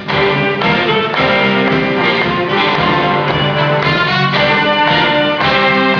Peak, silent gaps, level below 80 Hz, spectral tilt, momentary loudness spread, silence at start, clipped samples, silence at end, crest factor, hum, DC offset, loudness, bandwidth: 0 dBFS; none; -40 dBFS; -6.5 dB/octave; 3 LU; 0 s; under 0.1%; 0 s; 12 dB; none; under 0.1%; -12 LUFS; 5.4 kHz